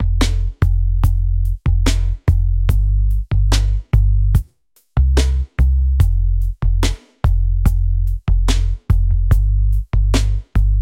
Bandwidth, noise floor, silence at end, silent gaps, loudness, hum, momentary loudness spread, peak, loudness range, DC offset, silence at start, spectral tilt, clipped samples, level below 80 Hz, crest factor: 11.5 kHz; -57 dBFS; 0 s; none; -18 LUFS; none; 4 LU; -2 dBFS; 1 LU; under 0.1%; 0 s; -6 dB/octave; under 0.1%; -16 dBFS; 14 dB